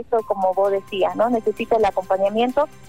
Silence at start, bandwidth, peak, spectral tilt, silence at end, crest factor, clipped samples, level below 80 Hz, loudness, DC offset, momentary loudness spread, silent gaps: 0 s; 16 kHz; -8 dBFS; -5.5 dB/octave; 0.2 s; 12 dB; under 0.1%; -54 dBFS; -20 LUFS; 0.6%; 3 LU; none